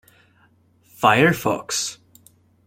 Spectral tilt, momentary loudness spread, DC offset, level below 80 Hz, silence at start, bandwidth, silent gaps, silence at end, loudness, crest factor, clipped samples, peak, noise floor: -4 dB/octave; 9 LU; under 0.1%; -58 dBFS; 1 s; 16.5 kHz; none; 0.7 s; -19 LUFS; 22 dB; under 0.1%; -2 dBFS; -58 dBFS